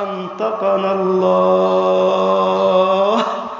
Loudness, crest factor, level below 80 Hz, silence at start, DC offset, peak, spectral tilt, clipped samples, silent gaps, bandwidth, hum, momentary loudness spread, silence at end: -15 LUFS; 14 dB; -64 dBFS; 0 s; under 0.1%; -2 dBFS; -6.5 dB/octave; under 0.1%; none; 7.6 kHz; none; 5 LU; 0 s